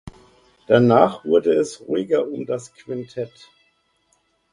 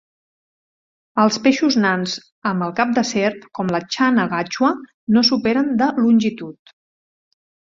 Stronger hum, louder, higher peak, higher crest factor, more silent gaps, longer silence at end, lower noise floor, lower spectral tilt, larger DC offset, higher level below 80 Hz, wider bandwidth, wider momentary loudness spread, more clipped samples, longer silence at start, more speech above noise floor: neither; about the same, -19 LUFS vs -18 LUFS; about the same, 0 dBFS vs -2 dBFS; about the same, 20 dB vs 18 dB; second, none vs 2.32-2.42 s, 4.94-5.07 s; first, 1.25 s vs 1.1 s; second, -65 dBFS vs under -90 dBFS; first, -6.5 dB/octave vs -4.5 dB/octave; neither; about the same, -58 dBFS vs -62 dBFS; first, 11 kHz vs 7.6 kHz; first, 17 LU vs 10 LU; neither; second, 0.05 s vs 1.15 s; second, 46 dB vs over 72 dB